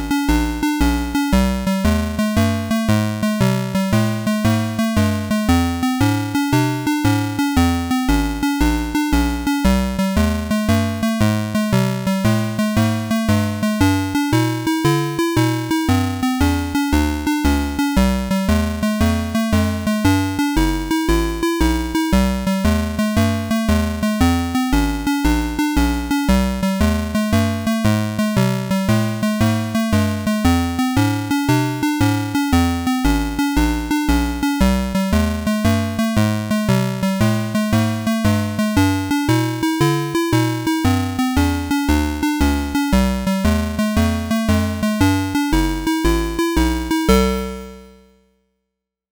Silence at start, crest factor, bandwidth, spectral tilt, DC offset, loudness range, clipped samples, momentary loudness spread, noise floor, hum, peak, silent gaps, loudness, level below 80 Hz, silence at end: 0 s; 12 dB; over 20 kHz; -5.5 dB/octave; 0.1%; 0 LU; under 0.1%; 3 LU; -79 dBFS; none; -6 dBFS; none; -18 LUFS; -26 dBFS; 1.25 s